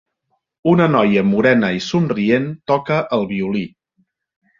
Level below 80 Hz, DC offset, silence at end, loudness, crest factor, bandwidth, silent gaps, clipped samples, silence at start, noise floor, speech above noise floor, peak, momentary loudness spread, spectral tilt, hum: -54 dBFS; under 0.1%; 0.9 s; -17 LUFS; 16 dB; 7.4 kHz; none; under 0.1%; 0.65 s; -70 dBFS; 54 dB; -2 dBFS; 8 LU; -7 dB/octave; none